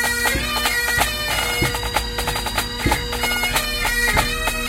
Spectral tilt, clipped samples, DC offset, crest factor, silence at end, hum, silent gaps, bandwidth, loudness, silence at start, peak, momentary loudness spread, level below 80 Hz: -2.5 dB/octave; under 0.1%; under 0.1%; 18 dB; 0 s; none; none; 17 kHz; -19 LUFS; 0 s; -4 dBFS; 4 LU; -30 dBFS